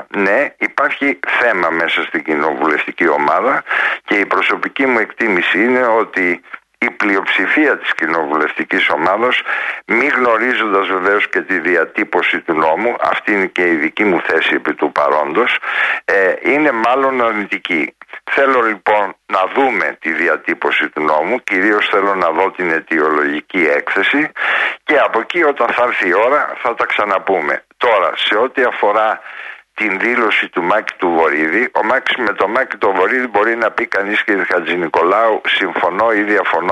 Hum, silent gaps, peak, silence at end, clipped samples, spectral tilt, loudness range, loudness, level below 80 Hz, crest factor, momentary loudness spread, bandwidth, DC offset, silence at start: none; none; -2 dBFS; 0 s; under 0.1%; -5 dB/octave; 1 LU; -14 LUFS; -62 dBFS; 14 dB; 4 LU; 11.5 kHz; under 0.1%; 0 s